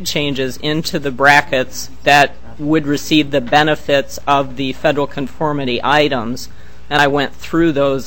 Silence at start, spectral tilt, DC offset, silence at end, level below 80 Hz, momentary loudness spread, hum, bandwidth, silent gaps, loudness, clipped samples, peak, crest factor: 0 s; -4.5 dB/octave; 5%; 0 s; -40 dBFS; 10 LU; none; 18.5 kHz; none; -15 LUFS; 0.2%; 0 dBFS; 16 dB